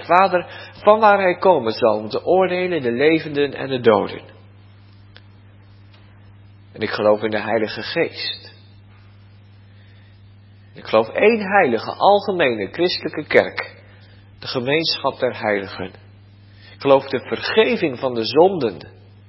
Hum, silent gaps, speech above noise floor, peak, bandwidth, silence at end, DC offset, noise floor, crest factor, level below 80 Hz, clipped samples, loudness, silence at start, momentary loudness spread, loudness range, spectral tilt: 60 Hz at -55 dBFS; none; 28 dB; 0 dBFS; 5.8 kHz; 0.4 s; under 0.1%; -46 dBFS; 20 dB; -56 dBFS; under 0.1%; -18 LUFS; 0 s; 12 LU; 9 LU; -8 dB/octave